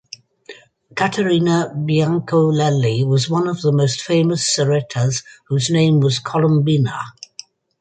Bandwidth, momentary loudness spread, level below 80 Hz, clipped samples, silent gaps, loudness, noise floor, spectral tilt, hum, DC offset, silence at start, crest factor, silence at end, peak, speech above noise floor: 9.4 kHz; 14 LU; -56 dBFS; under 0.1%; none; -17 LUFS; -42 dBFS; -5.5 dB/octave; none; under 0.1%; 0.5 s; 14 dB; 0.7 s; -4 dBFS; 26 dB